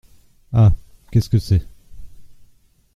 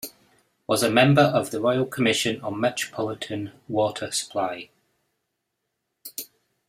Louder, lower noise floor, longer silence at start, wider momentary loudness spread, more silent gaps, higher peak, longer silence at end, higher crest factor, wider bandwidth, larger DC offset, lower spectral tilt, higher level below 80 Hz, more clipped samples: first, -19 LUFS vs -23 LUFS; second, -54 dBFS vs -79 dBFS; first, 0.5 s vs 0.05 s; second, 7 LU vs 19 LU; neither; about the same, -2 dBFS vs -2 dBFS; first, 0.7 s vs 0.45 s; second, 18 dB vs 24 dB; second, 13 kHz vs 16 kHz; neither; first, -8 dB/octave vs -4.5 dB/octave; first, -32 dBFS vs -64 dBFS; neither